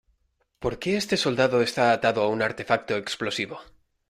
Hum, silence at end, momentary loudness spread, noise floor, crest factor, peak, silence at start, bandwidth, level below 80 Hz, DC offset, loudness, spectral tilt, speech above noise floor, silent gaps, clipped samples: none; 0.45 s; 10 LU; -71 dBFS; 20 dB; -6 dBFS; 0.6 s; 15.5 kHz; -56 dBFS; under 0.1%; -25 LUFS; -4.5 dB/octave; 46 dB; none; under 0.1%